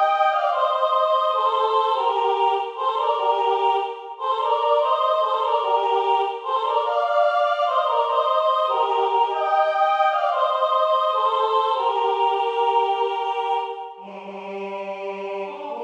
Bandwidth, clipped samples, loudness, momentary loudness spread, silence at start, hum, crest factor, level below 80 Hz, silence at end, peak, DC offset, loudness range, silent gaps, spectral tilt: 8.6 kHz; under 0.1%; -21 LUFS; 11 LU; 0 s; none; 14 dB; -88 dBFS; 0 s; -6 dBFS; under 0.1%; 3 LU; none; -3.5 dB/octave